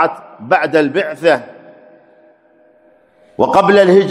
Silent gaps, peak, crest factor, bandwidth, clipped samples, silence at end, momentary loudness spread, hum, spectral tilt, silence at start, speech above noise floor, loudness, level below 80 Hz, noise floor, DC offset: none; 0 dBFS; 14 dB; 11.5 kHz; 0.1%; 0 s; 9 LU; none; -6 dB/octave; 0 s; 38 dB; -13 LUFS; -58 dBFS; -50 dBFS; under 0.1%